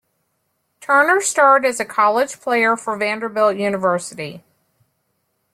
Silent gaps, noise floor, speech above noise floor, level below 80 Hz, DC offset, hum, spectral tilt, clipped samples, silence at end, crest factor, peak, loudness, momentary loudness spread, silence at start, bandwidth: none; -70 dBFS; 53 dB; -68 dBFS; under 0.1%; none; -3 dB/octave; under 0.1%; 1.15 s; 18 dB; -2 dBFS; -17 LUFS; 12 LU; 0.8 s; 16 kHz